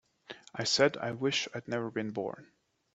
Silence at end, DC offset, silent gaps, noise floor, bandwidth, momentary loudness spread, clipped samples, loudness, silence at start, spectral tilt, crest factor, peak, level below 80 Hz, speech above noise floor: 0.5 s; under 0.1%; none; -52 dBFS; 8.4 kHz; 21 LU; under 0.1%; -32 LUFS; 0.3 s; -3.5 dB/octave; 24 dB; -10 dBFS; -74 dBFS; 20 dB